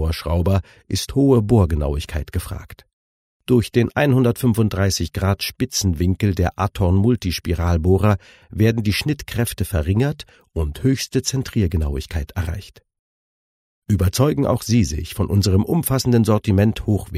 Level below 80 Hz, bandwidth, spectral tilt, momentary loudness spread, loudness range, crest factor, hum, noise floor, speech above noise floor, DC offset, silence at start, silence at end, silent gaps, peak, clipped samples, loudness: -32 dBFS; 16 kHz; -6 dB/octave; 10 LU; 4 LU; 16 dB; none; under -90 dBFS; over 71 dB; under 0.1%; 0 s; 0 s; 2.93-3.40 s, 12.99-13.82 s; -4 dBFS; under 0.1%; -19 LUFS